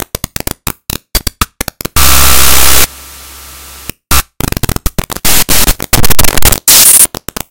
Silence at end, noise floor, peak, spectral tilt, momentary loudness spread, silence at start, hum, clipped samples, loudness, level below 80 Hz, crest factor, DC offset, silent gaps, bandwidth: 0 s; -30 dBFS; 0 dBFS; -1.5 dB/octave; 22 LU; 0 s; none; 9%; -7 LUFS; -18 dBFS; 8 dB; under 0.1%; none; over 20 kHz